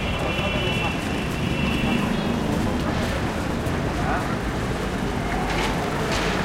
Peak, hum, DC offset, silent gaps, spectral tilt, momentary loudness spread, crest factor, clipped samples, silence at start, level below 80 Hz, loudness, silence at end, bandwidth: -10 dBFS; none; under 0.1%; none; -5.5 dB/octave; 3 LU; 14 dB; under 0.1%; 0 s; -34 dBFS; -24 LUFS; 0 s; 16.5 kHz